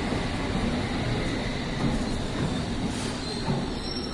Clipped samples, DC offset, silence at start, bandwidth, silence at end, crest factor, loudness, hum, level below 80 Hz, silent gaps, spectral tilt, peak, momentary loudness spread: under 0.1%; under 0.1%; 0 s; 11.5 kHz; 0 s; 14 dB; -29 LUFS; none; -36 dBFS; none; -5.5 dB/octave; -14 dBFS; 3 LU